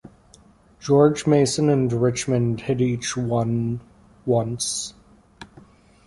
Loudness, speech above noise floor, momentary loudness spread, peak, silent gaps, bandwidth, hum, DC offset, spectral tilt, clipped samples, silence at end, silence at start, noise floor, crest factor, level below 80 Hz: -21 LUFS; 32 dB; 11 LU; -4 dBFS; none; 11.5 kHz; none; under 0.1%; -5.5 dB/octave; under 0.1%; 0.6 s; 0.8 s; -53 dBFS; 18 dB; -52 dBFS